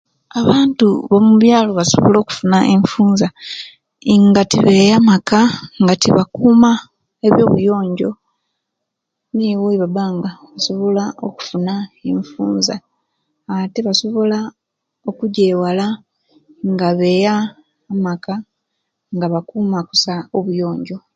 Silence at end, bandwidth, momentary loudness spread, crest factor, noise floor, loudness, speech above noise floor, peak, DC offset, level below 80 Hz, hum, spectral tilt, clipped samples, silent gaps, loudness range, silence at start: 0.15 s; 8.8 kHz; 15 LU; 14 dB; -77 dBFS; -15 LUFS; 63 dB; 0 dBFS; under 0.1%; -52 dBFS; none; -5.5 dB/octave; under 0.1%; none; 8 LU; 0.35 s